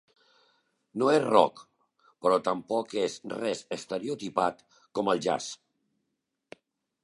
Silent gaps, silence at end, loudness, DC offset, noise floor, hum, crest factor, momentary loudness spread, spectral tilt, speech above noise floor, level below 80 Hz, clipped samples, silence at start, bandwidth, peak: none; 1.5 s; -28 LUFS; under 0.1%; -82 dBFS; none; 26 dB; 12 LU; -4.5 dB/octave; 54 dB; -74 dBFS; under 0.1%; 0.95 s; 11.5 kHz; -4 dBFS